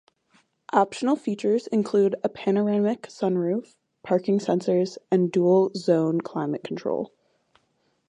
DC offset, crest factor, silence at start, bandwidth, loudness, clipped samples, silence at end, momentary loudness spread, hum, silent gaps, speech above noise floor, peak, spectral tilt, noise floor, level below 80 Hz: under 0.1%; 20 dB; 0.75 s; 10 kHz; -24 LUFS; under 0.1%; 1 s; 8 LU; none; none; 47 dB; -6 dBFS; -7.5 dB/octave; -70 dBFS; -74 dBFS